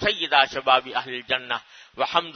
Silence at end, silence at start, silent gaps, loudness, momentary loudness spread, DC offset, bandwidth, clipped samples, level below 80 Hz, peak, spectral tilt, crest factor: 0.05 s; 0 s; none; -23 LUFS; 10 LU; under 0.1%; 6.6 kHz; under 0.1%; -58 dBFS; -2 dBFS; -3 dB/octave; 22 dB